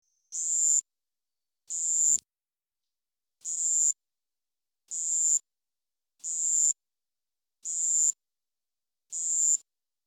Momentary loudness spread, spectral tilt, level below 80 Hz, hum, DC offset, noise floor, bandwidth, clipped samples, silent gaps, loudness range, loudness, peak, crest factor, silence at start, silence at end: 14 LU; 3.5 dB/octave; -86 dBFS; none; under 0.1%; under -90 dBFS; 16 kHz; under 0.1%; none; 1 LU; -25 LUFS; -12 dBFS; 18 dB; 0.3 s; 0.5 s